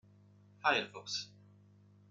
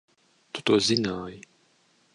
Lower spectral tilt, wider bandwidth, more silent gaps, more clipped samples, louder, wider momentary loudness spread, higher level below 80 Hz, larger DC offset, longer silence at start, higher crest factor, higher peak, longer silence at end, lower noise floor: second, -2 dB/octave vs -4 dB/octave; about the same, 11 kHz vs 11 kHz; neither; neither; second, -35 LUFS vs -25 LUFS; second, 10 LU vs 18 LU; second, -88 dBFS vs -62 dBFS; neither; about the same, 0.65 s vs 0.55 s; about the same, 24 dB vs 22 dB; second, -16 dBFS vs -6 dBFS; about the same, 0.8 s vs 0.75 s; about the same, -63 dBFS vs -65 dBFS